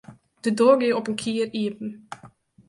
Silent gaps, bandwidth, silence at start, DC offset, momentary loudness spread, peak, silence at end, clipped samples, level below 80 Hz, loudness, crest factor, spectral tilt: none; 11.5 kHz; 0.1 s; under 0.1%; 23 LU; -4 dBFS; 0.4 s; under 0.1%; -68 dBFS; -23 LUFS; 20 dB; -5 dB/octave